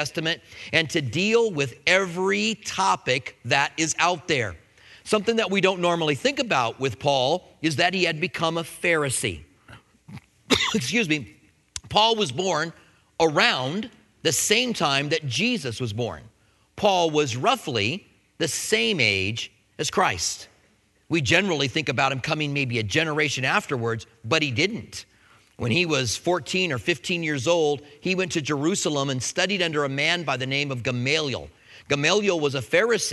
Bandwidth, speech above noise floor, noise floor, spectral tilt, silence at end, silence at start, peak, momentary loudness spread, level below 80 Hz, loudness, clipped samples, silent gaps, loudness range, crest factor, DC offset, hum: 12 kHz; 39 dB; -62 dBFS; -3.5 dB/octave; 0 s; 0 s; -2 dBFS; 9 LU; -58 dBFS; -23 LUFS; under 0.1%; none; 2 LU; 24 dB; under 0.1%; none